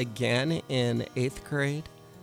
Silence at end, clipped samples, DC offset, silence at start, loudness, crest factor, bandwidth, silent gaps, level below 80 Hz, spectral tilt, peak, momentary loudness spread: 0 s; under 0.1%; under 0.1%; 0 s; -29 LUFS; 14 dB; 15.5 kHz; none; -56 dBFS; -5.5 dB/octave; -14 dBFS; 6 LU